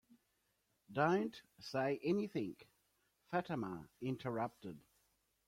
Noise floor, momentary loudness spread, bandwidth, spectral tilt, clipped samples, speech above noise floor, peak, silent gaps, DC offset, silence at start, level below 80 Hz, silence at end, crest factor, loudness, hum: -82 dBFS; 18 LU; 16 kHz; -7 dB/octave; under 0.1%; 42 dB; -22 dBFS; none; under 0.1%; 0.9 s; -78 dBFS; 0.7 s; 20 dB; -41 LUFS; none